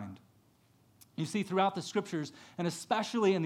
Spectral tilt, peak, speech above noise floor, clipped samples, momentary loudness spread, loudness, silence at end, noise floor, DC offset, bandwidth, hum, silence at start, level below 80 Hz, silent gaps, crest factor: -5.5 dB/octave; -14 dBFS; 34 dB; under 0.1%; 13 LU; -34 LUFS; 0 s; -67 dBFS; under 0.1%; 15 kHz; none; 0 s; -82 dBFS; none; 20 dB